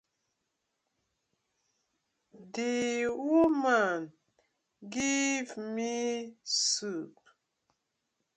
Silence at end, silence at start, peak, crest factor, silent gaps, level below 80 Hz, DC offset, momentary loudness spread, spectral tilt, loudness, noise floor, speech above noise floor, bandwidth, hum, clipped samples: 1.25 s; 2.35 s; -14 dBFS; 20 dB; none; -74 dBFS; under 0.1%; 14 LU; -2 dB/octave; -30 LUFS; -83 dBFS; 52 dB; 9.6 kHz; none; under 0.1%